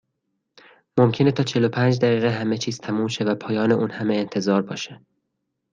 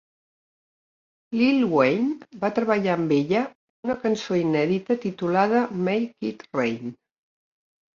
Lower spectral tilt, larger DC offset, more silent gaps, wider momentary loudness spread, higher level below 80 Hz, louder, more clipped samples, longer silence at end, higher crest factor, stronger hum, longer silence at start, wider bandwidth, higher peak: about the same, -6.5 dB/octave vs -7 dB/octave; neither; second, none vs 3.55-3.83 s; second, 7 LU vs 10 LU; about the same, -64 dBFS vs -66 dBFS; about the same, -22 LUFS vs -24 LUFS; neither; second, 0.75 s vs 1 s; about the same, 18 dB vs 18 dB; neither; second, 0.95 s vs 1.3 s; first, 9.2 kHz vs 7.4 kHz; about the same, -4 dBFS vs -6 dBFS